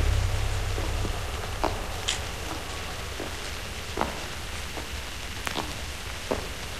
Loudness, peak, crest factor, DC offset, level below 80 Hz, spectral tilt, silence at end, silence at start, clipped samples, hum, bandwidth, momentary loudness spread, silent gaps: -32 LUFS; -8 dBFS; 22 dB; 0.7%; -34 dBFS; -3.5 dB/octave; 0 s; 0 s; under 0.1%; none; 15 kHz; 5 LU; none